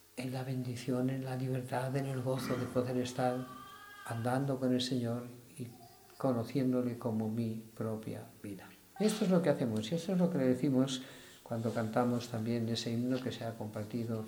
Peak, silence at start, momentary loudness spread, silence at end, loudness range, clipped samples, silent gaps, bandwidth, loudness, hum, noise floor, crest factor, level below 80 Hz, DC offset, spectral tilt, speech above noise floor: -16 dBFS; 0.15 s; 16 LU; 0 s; 4 LU; under 0.1%; none; over 20 kHz; -35 LUFS; none; -56 dBFS; 18 dB; -72 dBFS; under 0.1%; -6.5 dB/octave; 22 dB